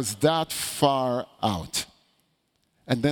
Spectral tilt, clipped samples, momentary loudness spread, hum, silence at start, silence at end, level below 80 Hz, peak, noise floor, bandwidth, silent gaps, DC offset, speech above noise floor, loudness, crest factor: -4.5 dB/octave; under 0.1%; 7 LU; none; 0 s; 0 s; -56 dBFS; -6 dBFS; -71 dBFS; over 20 kHz; none; under 0.1%; 46 dB; -26 LUFS; 20 dB